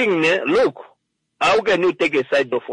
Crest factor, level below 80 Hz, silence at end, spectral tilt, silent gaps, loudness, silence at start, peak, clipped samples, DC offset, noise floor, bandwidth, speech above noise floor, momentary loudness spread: 12 dB; -58 dBFS; 0 s; -4.5 dB/octave; none; -18 LUFS; 0 s; -6 dBFS; under 0.1%; under 0.1%; -64 dBFS; 10.5 kHz; 46 dB; 4 LU